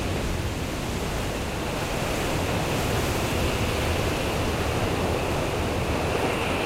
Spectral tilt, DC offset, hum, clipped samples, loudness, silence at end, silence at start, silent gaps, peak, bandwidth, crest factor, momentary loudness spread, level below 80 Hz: -5 dB/octave; under 0.1%; none; under 0.1%; -26 LUFS; 0 s; 0 s; none; -10 dBFS; 16 kHz; 14 dB; 4 LU; -34 dBFS